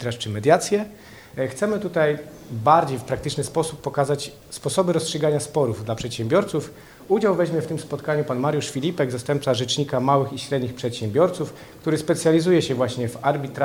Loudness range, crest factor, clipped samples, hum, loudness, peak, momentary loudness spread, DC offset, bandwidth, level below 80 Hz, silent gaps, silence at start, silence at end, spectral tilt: 2 LU; 20 dB; under 0.1%; none; -23 LUFS; -2 dBFS; 10 LU; under 0.1%; 20 kHz; -54 dBFS; none; 0 s; 0 s; -5.5 dB/octave